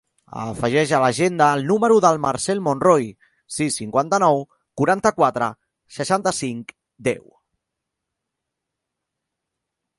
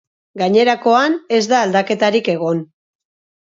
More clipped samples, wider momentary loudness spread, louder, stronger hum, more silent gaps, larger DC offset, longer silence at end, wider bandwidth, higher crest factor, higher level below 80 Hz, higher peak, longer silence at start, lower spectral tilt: neither; first, 15 LU vs 7 LU; second, -19 LUFS vs -15 LUFS; neither; neither; neither; first, 2.8 s vs 0.75 s; first, 11.5 kHz vs 7.6 kHz; about the same, 20 dB vs 16 dB; first, -58 dBFS vs -68 dBFS; about the same, 0 dBFS vs 0 dBFS; about the same, 0.35 s vs 0.35 s; about the same, -5 dB/octave vs -5 dB/octave